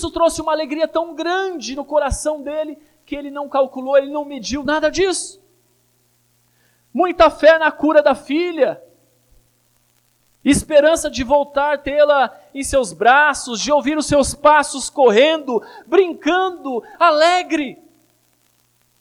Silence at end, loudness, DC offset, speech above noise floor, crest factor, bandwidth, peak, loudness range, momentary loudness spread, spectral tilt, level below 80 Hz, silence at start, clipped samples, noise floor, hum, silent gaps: 1.25 s; -17 LUFS; under 0.1%; 44 dB; 16 dB; 14 kHz; -2 dBFS; 6 LU; 13 LU; -3.5 dB/octave; -42 dBFS; 0 s; under 0.1%; -60 dBFS; 60 Hz at -55 dBFS; none